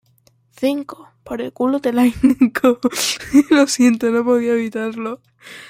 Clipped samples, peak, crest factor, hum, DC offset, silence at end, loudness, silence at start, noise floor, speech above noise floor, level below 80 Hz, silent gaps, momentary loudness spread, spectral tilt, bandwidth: under 0.1%; -2 dBFS; 16 dB; none; under 0.1%; 0.05 s; -17 LUFS; 0.6 s; -57 dBFS; 40 dB; -50 dBFS; none; 14 LU; -3.5 dB/octave; 16.5 kHz